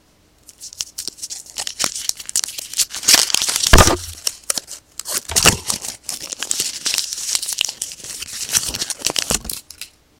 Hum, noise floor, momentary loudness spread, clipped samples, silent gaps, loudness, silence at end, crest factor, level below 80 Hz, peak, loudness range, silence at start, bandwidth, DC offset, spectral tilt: none; -50 dBFS; 17 LU; under 0.1%; none; -18 LUFS; 0.35 s; 20 dB; -30 dBFS; 0 dBFS; 6 LU; 0.6 s; 17.5 kHz; under 0.1%; -1.5 dB/octave